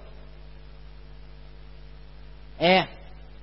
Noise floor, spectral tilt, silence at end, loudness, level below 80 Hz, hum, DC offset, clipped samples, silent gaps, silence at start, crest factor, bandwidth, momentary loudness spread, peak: -46 dBFS; -9 dB/octave; 0.5 s; -23 LUFS; -46 dBFS; none; 0.4%; under 0.1%; none; 0.85 s; 26 dB; 5.8 kHz; 28 LU; -6 dBFS